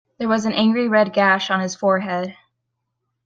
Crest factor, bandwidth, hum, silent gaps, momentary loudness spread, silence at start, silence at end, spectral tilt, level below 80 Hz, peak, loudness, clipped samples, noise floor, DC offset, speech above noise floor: 16 dB; 7.8 kHz; none; none; 9 LU; 0.2 s; 0.95 s; -5 dB/octave; -66 dBFS; -4 dBFS; -19 LUFS; under 0.1%; -76 dBFS; under 0.1%; 58 dB